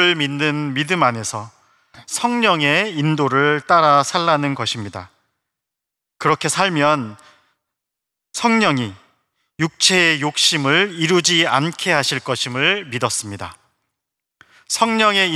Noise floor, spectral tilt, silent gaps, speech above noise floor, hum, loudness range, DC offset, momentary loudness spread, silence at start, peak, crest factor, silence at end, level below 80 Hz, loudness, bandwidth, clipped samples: -82 dBFS; -3.5 dB/octave; none; 65 dB; none; 6 LU; under 0.1%; 12 LU; 0 s; -2 dBFS; 18 dB; 0 s; -68 dBFS; -17 LUFS; 14.5 kHz; under 0.1%